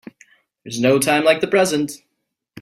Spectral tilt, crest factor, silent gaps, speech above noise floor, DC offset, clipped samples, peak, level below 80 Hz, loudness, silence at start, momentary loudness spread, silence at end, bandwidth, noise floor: -4 dB/octave; 18 dB; none; 58 dB; under 0.1%; under 0.1%; -2 dBFS; -60 dBFS; -17 LUFS; 0.65 s; 14 LU; 0 s; 16 kHz; -75 dBFS